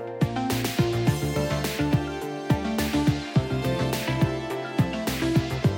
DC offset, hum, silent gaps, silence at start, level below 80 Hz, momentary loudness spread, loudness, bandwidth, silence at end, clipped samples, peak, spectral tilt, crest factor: under 0.1%; none; none; 0 s; -42 dBFS; 3 LU; -26 LUFS; 17 kHz; 0 s; under 0.1%; -10 dBFS; -6 dB/octave; 16 dB